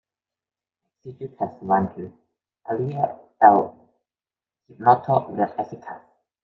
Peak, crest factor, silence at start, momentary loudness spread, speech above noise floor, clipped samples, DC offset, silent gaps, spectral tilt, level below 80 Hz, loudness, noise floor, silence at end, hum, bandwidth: -2 dBFS; 22 dB; 1.05 s; 23 LU; over 68 dB; under 0.1%; under 0.1%; none; -10 dB/octave; -68 dBFS; -22 LUFS; under -90 dBFS; 0.45 s; none; 4.7 kHz